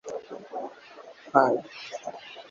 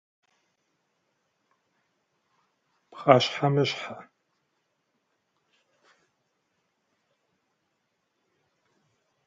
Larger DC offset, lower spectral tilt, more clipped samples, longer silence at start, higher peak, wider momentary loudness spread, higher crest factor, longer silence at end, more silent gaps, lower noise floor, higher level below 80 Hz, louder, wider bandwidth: neither; about the same, -5 dB/octave vs -5.5 dB/octave; neither; second, 0.05 s vs 2.95 s; about the same, -4 dBFS vs -2 dBFS; first, 24 LU vs 19 LU; about the same, 26 dB vs 30 dB; second, 0.05 s vs 5.25 s; neither; second, -48 dBFS vs -77 dBFS; about the same, -76 dBFS vs -80 dBFS; second, -28 LUFS vs -24 LUFS; about the same, 7.6 kHz vs 7.6 kHz